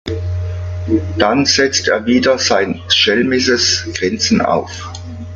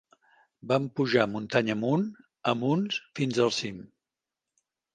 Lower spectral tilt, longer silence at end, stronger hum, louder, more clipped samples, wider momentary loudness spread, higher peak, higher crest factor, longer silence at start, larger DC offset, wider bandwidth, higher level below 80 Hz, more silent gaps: second, -3.5 dB/octave vs -5.5 dB/octave; second, 0 s vs 1.15 s; neither; first, -14 LUFS vs -28 LUFS; neither; first, 12 LU vs 9 LU; first, 0 dBFS vs -6 dBFS; second, 16 dB vs 24 dB; second, 0.05 s vs 0.65 s; neither; about the same, 9.4 kHz vs 9.8 kHz; first, -44 dBFS vs -70 dBFS; neither